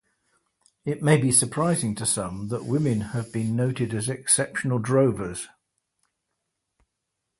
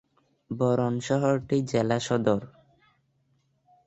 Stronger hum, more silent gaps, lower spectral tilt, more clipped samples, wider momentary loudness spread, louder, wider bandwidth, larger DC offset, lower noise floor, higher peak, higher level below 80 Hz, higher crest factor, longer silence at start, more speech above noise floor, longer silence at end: neither; neither; second, -5 dB/octave vs -6.5 dB/octave; neither; first, 12 LU vs 3 LU; about the same, -24 LUFS vs -26 LUFS; first, 12 kHz vs 8.2 kHz; neither; first, -81 dBFS vs -70 dBFS; first, -4 dBFS vs -10 dBFS; first, -56 dBFS vs -62 dBFS; about the same, 22 dB vs 18 dB; first, 0.85 s vs 0.5 s; first, 57 dB vs 44 dB; first, 1.95 s vs 1.4 s